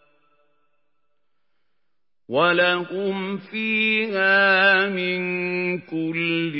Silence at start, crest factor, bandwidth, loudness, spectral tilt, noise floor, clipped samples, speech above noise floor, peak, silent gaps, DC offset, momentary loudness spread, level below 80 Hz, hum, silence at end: 2.3 s; 18 dB; 5.8 kHz; -20 LUFS; -9.5 dB/octave; -82 dBFS; under 0.1%; 61 dB; -4 dBFS; none; under 0.1%; 11 LU; -80 dBFS; none; 0 s